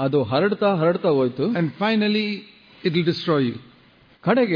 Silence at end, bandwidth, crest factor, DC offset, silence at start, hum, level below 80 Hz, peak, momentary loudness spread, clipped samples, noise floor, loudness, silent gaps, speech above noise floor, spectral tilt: 0 s; 5.2 kHz; 14 dB; under 0.1%; 0 s; none; -64 dBFS; -6 dBFS; 8 LU; under 0.1%; -54 dBFS; -21 LUFS; none; 33 dB; -8.5 dB/octave